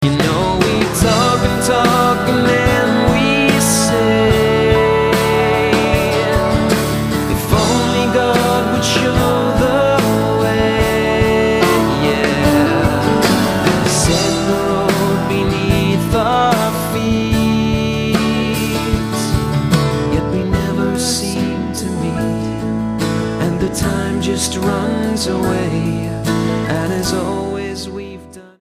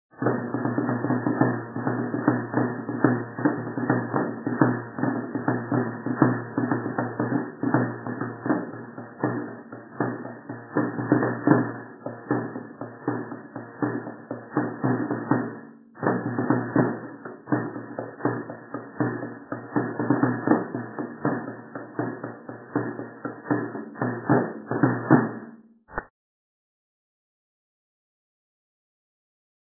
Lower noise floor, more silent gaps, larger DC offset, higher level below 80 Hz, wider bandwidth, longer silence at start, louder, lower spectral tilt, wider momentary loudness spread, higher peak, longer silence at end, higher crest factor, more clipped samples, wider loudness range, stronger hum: second, -34 dBFS vs -47 dBFS; neither; neither; first, -30 dBFS vs -64 dBFS; first, 15.5 kHz vs 2 kHz; second, 0 s vs 0.15 s; first, -15 LUFS vs -27 LUFS; second, -5 dB/octave vs -13.5 dB/octave; second, 6 LU vs 14 LU; about the same, 0 dBFS vs -2 dBFS; second, 0.2 s vs 3.75 s; second, 14 dB vs 26 dB; neither; about the same, 5 LU vs 5 LU; neither